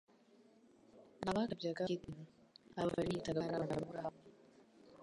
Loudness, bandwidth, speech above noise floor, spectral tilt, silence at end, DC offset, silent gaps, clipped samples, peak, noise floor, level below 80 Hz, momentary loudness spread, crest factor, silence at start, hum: -41 LUFS; 11.5 kHz; 27 dB; -6.5 dB/octave; 0 s; under 0.1%; none; under 0.1%; -24 dBFS; -67 dBFS; -68 dBFS; 13 LU; 20 dB; 0.95 s; none